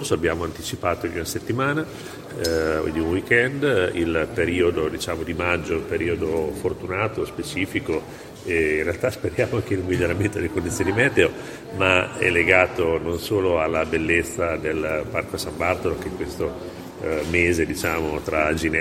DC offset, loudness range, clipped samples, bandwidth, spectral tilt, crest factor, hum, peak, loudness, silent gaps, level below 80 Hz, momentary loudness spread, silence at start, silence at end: under 0.1%; 5 LU; under 0.1%; 16.5 kHz; -5 dB/octave; 22 dB; none; 0 dBFS; -23 LUFS; none; -42 dBFS; 9 LU; 0 s; 0 s